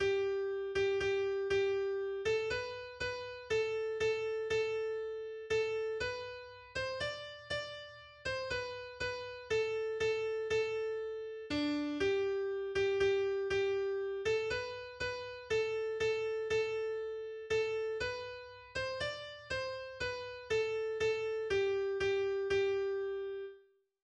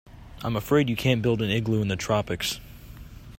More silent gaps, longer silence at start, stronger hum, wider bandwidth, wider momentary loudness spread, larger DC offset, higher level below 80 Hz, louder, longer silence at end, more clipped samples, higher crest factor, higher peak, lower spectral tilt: neither; about the same, 0 s vs 0.1 s; neither; second, 9.4 kHz vs 16 kHz; second, 10 LU vs 22 LU; neither; second, -62 dBFS vs -48 dBFS; second, -36 LUFS vs -25 LUFS; first, 0.45 s vs 0 s; neither; about the same, 14 dB vs 18 dB; second, -22 dBFS vs -8 dBFS; about the same, -4.5 dB/octave vs -5.5 dB/octave